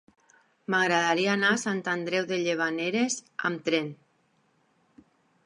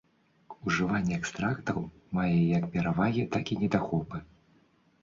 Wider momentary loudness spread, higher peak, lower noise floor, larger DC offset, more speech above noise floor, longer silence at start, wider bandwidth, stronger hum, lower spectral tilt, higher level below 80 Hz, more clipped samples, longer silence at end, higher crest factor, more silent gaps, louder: about the same, 7 LU vs 9 LU; about the same, -10 dBFS vs -12 dBFS; first, -69 dBFS vs -65 dBFS; neither; first, 42 dB vs 36 dB; first, 0.7 s vs 0.5 s; first, 11.5 kHz vs 7.6 kHz; neither; second, -3.5 dB/octave vs -6.5 dB/octave; second, -80 dBFS vs -54 dBFS; neither; first, 1.5 s vs 0.8 s; about the same, 20 dB vs 18 dB; neither; first, -27 LUFS vs -30 LUFS